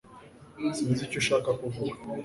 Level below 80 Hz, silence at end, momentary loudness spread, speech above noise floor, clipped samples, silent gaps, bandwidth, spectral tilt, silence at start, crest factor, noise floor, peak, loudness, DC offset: -60 dBFS; 0 s; 8 LU; 22 dB; under 0.1%; none; 11.5 kHz; -5 dB/octave; 0.05 s; 18 dB; -51 dBFS; -14 dBFS; -29 LUFS; under 0.1%